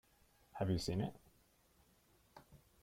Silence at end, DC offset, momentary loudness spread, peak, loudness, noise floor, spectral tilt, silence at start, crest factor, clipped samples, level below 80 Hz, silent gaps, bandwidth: 0.25 s; under 0.1%; 25 LU; -26 dBFS; -41 LUFS; -73 dBFS; -6.5 dB/octave; 0.55 s; 18 dB; under 0.1%; -64 dBFS; none; 16 kHz